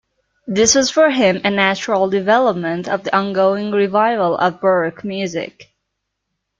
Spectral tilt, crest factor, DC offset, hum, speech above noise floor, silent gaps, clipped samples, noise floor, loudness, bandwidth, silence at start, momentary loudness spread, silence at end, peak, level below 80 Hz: -3.5 dB/octave; 16 dB; under 0.1%; none; 60 dB; none; under 0.1%; -75 dBFS; -16 LUFS; 9.4 kHz; 0.45 s; 10 LU; 0.95 s; 0 dBFS; -56 dBFS